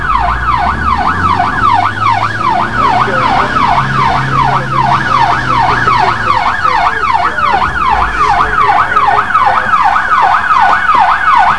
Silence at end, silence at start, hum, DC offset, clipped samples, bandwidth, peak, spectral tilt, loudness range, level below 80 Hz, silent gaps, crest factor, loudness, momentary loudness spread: 0 s; 0 s; none; 6%; 0.3%; 11 kHz; 0 dBFS; -5 dB/octave; 2 LU; -28 dBFS; none; 10 dB; -10 LUFS; 4 LU